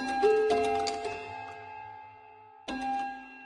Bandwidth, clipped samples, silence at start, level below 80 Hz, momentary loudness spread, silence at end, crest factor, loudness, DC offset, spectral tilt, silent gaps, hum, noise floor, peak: 11 kHz; under 0.1%; 0 s; -64 dBFS; 20 LU; 0 s; 18 dB; -30 LUFS; under 0.1%; -3.5 dB/octave; none; none; -53 dBFS; -14 dBFS